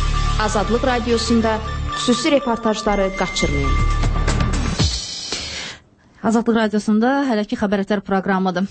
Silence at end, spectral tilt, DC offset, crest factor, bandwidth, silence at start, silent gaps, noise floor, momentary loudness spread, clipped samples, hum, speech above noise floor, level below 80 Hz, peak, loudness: 0 s; -5 dB/octave; under 0.1%; 14 dB; 8.8 kHz; 0 s; none; -46 dBFS; 7 LU; under 0.1%; none; 28 dB; -26 dBFS; -4 dBFS; -19 LUFS